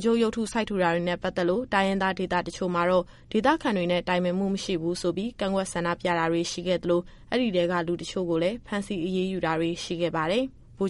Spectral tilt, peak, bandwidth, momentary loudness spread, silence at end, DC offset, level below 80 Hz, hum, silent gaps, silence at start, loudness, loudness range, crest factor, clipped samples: -5.5 dB/octave; -10 dBFS; 11.5 kHz; 5 LU; 0 s; under 0.1%; -52 dBFS; none; none; 0 s; -27 LUFS; 2 LU; 18 dB; under 0.1%